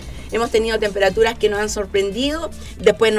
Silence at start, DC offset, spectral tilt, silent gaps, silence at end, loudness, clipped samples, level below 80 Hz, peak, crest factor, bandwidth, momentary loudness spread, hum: 0 s; under 0.1%; -3.5 dB/octave; none; 0 s; -19 LUFS; under 0.1%; -36 dBFS; -2 dBFS; 16 dB; 15 kHz; 8 LU; none